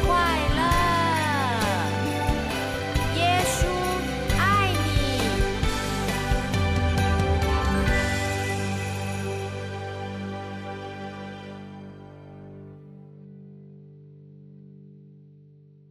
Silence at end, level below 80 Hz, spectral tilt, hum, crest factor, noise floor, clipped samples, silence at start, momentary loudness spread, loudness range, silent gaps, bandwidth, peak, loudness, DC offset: 0.7 s; -34 dBFS; -5 dB/octave; 50 Hz at -55 dBFS; 14 dB; -52 dBFS; under 0.1%; 0 s; 22 LU; 18 LU; none; 14 kHz; -10 dBFS; -25 LUFS; under 0.1%